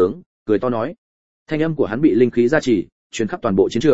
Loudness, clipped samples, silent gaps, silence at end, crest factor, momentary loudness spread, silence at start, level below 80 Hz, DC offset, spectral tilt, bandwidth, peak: -19 LUFS; under 0.1%; 0.26-0.46 s, 0.98-1.46 s, 2.92-3.10 s; 0 s; 18 dB; 11 LU; 0 s; -52 dBFS; 0.9%; -6.5 dB/octave; 8 kHz; 0 dBFS